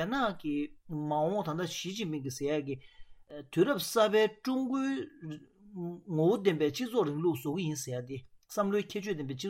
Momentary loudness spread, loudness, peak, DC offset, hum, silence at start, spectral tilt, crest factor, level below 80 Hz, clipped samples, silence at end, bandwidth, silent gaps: 15 LU; -32 LUFS; -14 dBFS; under 0.1%; none; 0 s; -5.5 dB/octave; 18 dB; -66 dBFS; under 0.1%; 0 s; 17 kHz; none